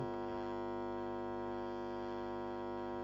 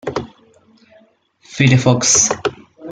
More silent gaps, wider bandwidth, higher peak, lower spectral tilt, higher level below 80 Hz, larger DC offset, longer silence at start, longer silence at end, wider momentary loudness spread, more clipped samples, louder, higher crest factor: neither; second, 7.6 kHz vs 9.6 kHz; second, -30 dBFS vs 0 dBFS; first, -7.5 dB/octave vs -3.5 dB/octave; second, -64 dBFS vs -48 dBFS; neither; about the same, 0 s vs 0.05 s; about the same, 0 s vs 0 s; second, 1 LU vs 19 LU; neither; second, -42 LUFS vs -14 LUFS; about the same, 12 dB vs 16 dB